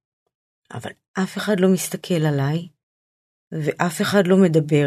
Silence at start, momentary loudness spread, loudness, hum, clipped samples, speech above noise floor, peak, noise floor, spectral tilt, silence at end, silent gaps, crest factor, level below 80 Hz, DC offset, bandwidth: 0.7 s; 18 LU; -20 LUFS; none; under 0.1%; over 71 dB; -2 dBFS; under -90 dBFS; -6 dB/octave; 0 s; 1.08-1.14 s, 2.83-3.51 s; 20 dB; -66 dBFS; under 0.1%; 14 kHz